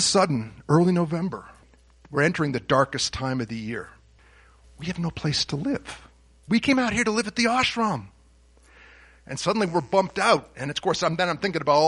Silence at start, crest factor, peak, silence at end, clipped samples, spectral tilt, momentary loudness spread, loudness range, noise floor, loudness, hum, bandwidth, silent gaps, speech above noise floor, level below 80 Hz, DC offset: 0 s; 20 dB; -4 dBFS; 0 s; under 0.1%; -4.5 dB/octave; 12 LU; 4 LU; -56 dBFS; -24 LUFS; none; 11 kHz; none; 32 dB; -52 dBFS; under 0.1%